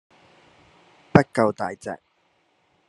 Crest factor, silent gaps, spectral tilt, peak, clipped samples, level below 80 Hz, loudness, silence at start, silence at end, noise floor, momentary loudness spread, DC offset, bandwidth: 26 dB; none; -7.5 dB/octave; 0 dBFS; under 0.1%; -54 dBFS; -22 LUFS; 1.15 s; 0.95 s; -66 dBFS; 17 LU; under 0.1%; 11.5 kHz